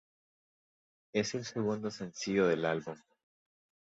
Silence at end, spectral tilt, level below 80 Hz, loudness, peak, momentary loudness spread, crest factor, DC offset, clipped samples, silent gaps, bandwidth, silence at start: 0.9 s; -5 dB/octave; -72 dBFS; -34 LUFS; -16 dBFS; 10 LU; 20 dB; under 0.1%; under 0.1%; none; 8 kHz; 1.15 s